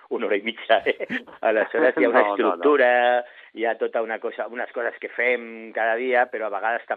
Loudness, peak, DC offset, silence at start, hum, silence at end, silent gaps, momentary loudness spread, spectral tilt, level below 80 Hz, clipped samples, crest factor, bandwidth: -22 LUFS; -4 dBFS; under 0.1%; 0.1 s; none; 0 s; none; 11 LU; -6 dB/octave; -78 dBFS; under 0.1%; 20 dB; 4.6 kHz